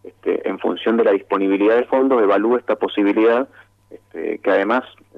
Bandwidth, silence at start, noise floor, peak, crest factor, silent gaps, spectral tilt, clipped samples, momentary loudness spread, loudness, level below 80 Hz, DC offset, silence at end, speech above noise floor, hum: 5.4 kHz; 0.05 s; -45 dBFS; -4 dBFS; 14 dB; none; -7 dB/octave; under 0.1%; 8 LU; -18 LUFS; -68 dBFS; under 0.1%; 0.3 s; 28 dB; none